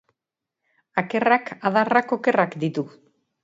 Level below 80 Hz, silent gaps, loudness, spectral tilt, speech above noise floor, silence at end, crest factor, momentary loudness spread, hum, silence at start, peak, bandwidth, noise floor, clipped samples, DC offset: -72 dBFS; none; -22 LUFS; -7 dB/octave; 64 dB; 0.55 s; 22 dB; 8 LU; none; 0.95 s; -2 dBFS; 7.8 kHz; -86 dBFS; under 0.1%; under 0.1%